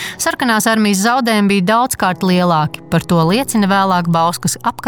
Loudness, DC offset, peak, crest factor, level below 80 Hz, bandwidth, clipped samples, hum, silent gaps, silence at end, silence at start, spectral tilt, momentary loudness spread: -14 LUFS; under 0.1%; -2 dBFS; 12 dB; -48 dBFS; 19.5 kHz; under 0.1%; none; none; 0 s; 0 s; -4.5 dB/octave; 4 LU